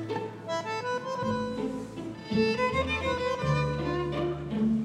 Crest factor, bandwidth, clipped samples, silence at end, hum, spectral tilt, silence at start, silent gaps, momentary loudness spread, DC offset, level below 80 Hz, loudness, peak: 16 dB; 11.5 kHz; under 0.1%; 0 s; none; -6.5 dB/octave; 0 s; none; 7 LU; under 0.1%; -48 dBFS; -30 LUFS; -14 dBFS